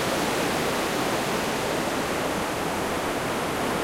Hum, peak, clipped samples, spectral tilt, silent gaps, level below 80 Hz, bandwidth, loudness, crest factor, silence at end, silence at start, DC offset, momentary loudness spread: none; -12 dBFS; under 0.1%; -3.5 dB/octave; none; -48 dBFS; 16 kHz; -26 LUFS; 14 dB; 0 s; 0 s; under 0.1%; 2 LU